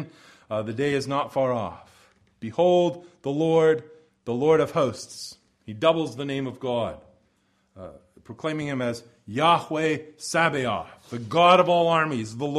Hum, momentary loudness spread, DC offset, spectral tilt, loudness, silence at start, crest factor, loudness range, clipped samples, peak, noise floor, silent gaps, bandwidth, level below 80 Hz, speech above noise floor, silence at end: none; 17 LU; under 0.1%; -5.5 dB/octave; -24 LUFS; 0 s; 20 dB; 7 LU; under 0.1%; -4 dBFS; -68 dBFS; none; 13 kHz; -62 dBFS; 44 dB; 0 s